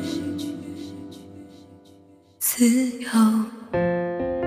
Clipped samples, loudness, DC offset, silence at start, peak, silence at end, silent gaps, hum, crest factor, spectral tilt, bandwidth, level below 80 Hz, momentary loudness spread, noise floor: under 0.1%; -23 LUFS; under 0.1%; 0 s; -8 dBFS; 0 s; none; none; 18 dB; -4.5 dB/octave; 15.5 kHz; -54 dBFS; 21 LU; -52 dBFS